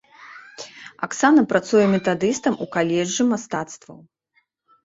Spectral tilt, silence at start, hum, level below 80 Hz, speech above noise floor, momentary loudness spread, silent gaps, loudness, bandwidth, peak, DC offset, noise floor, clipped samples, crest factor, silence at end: -5 dB/octave; 0.2 s; none; -62 dBFS; 47 dB; 21 LU; none; -20 LUFS; 8 kHz; -2 dBFS; under 0.1%; -67 dBFS; under 0.1%; 20 dB; 0.9 s